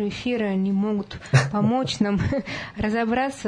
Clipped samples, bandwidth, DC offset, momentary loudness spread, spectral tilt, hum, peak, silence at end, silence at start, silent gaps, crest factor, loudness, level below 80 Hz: under 0.1%; 10.5 kHz; under 0.1%; 7 LU; -6.5 dB/octave; none; -4 dBFS; 0 s; 0 s; none; 18 dB; -24 LUFS; -46 dBFS